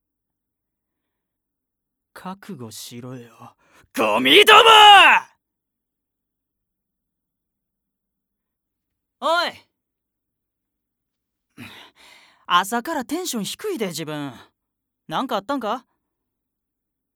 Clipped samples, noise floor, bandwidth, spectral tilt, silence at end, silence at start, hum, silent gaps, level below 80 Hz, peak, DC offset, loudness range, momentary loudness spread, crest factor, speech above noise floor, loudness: under 0.1%; -82 dBFS; 19.5 kHz; -2 dB/octave; 1.4 s; 2.25 s; none; none; -66 dBFS; 0 dBFS; under 0.1%; 16 LU; 27 LU; 22 dB; 64 dB; -15 LUFS